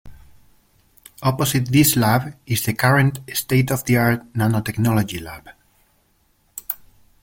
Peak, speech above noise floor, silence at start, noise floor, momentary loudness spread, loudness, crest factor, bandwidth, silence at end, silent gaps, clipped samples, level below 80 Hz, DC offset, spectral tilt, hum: -2 dBFS; 43 dB; 0.05 s; -62 dBFS; 15 LU; -19 LUFS; 18 dB; 17 kHz; 0.5 s; none; under 0.1%; -48 dBFS; under 0.1%; -5 dB/octave; none